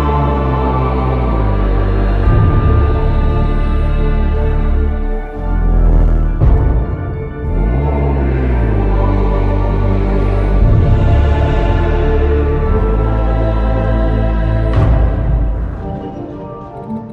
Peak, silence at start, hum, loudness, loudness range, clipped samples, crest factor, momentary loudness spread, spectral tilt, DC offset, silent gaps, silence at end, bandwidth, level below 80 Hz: -2 dBFS; 0 s; none; -15 LUFS; 2 LU; under 0.1%; 10 dB; 9 LU; -10 dB/octave; under 0.1%; none; 0 s; 4.5 kHz; -14 dBFS